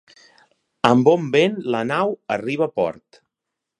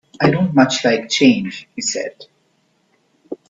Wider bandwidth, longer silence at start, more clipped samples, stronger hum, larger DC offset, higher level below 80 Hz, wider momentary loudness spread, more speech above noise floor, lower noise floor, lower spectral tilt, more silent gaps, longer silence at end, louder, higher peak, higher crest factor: first, 10.5 kHz vs 8 kHz; first, 0.85 s vs 0.2 s; neither; neither; neither; second, -64 dBFS vs -58 dBFS; second, 9 LU vs 14 LU; first, 63 dB vs 46 dB; first, -83 dBFS vs -62 dBFS; first, -6.5 dB/octave vs -4.5 dB/octave; neither; first, 0.85 s vs 0.15 s; second, -20 LUFS vs -16 LUFS; about the same, 0 dBFS vs 0 dBFS; about the same, 20 dB vs 18 dB